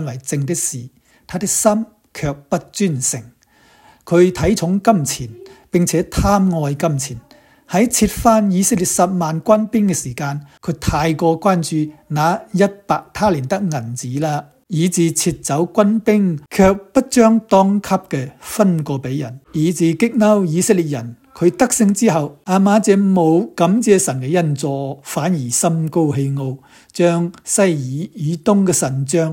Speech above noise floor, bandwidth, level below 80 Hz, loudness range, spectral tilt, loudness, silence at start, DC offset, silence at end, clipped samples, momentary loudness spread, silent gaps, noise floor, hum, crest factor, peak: 36 dB; 16.5 kHz; -40 dBFS; 4 LU; -5.5 dB/octave; -17 LUFS; 0 s; under 0.1%; 0 s; under 0.1%; 11 LU; none; -52 dBFS; none; 16 dB; 0 dBFS